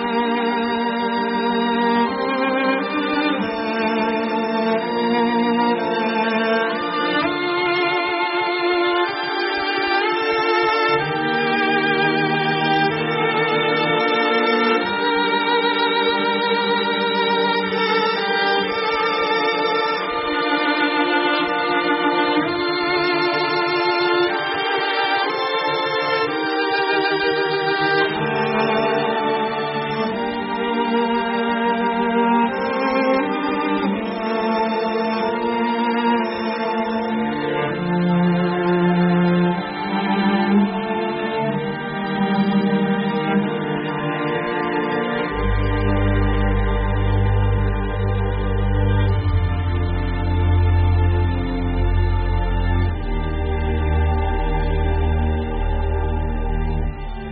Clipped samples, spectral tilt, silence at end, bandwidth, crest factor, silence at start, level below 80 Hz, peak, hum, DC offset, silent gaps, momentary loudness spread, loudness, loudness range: under 0.1%; -4 dB/octave; 0 s; 5.8 kHz; 14 dB; 0 s; -28 dBFS; -6 dBFS; none; under 0.1%; none; 5 LU; -20 LUFS; 3 LU